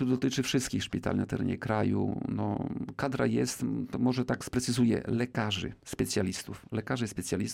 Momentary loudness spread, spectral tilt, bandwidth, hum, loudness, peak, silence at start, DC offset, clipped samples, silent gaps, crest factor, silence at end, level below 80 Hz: 6 LU; -5 dB/octave; 16 kHz; none; -31 LUFS; -16 dBFS; 0 s; under 0.1%; under 0.1%; none; 14 dB; 0 s; -56 dBFS